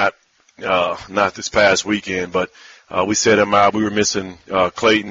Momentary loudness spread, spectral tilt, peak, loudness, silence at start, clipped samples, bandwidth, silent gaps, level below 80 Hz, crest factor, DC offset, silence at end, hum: 9 LU; -2.5 dB/octave; -2 dBFS; -17 LUFS; 0 s; under 0.1%; 7.8 kHz; none; -50 dBFS; 16 dB; under 0.1%; 0 s; none